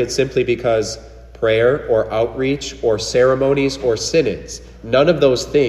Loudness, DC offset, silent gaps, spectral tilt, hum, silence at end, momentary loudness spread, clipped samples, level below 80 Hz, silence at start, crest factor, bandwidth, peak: -17 LUFS; under 0.1%; none; -5 dB/octave; none; 0 s; 8 LU; under 0.1%; -40 dBFS; 0 s; 16 dB; 13 kHz; -2 dBFS